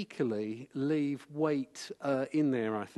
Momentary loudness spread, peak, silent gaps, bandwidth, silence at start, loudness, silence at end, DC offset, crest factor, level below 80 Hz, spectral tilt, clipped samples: 8 LU; -16 dBFS; none; 12 kHz; 0 s; -33 LUFS; 0.1 s; under 0.1%; 16 dB; -80 dBFS; -6.5 dB/octave; under 0.1%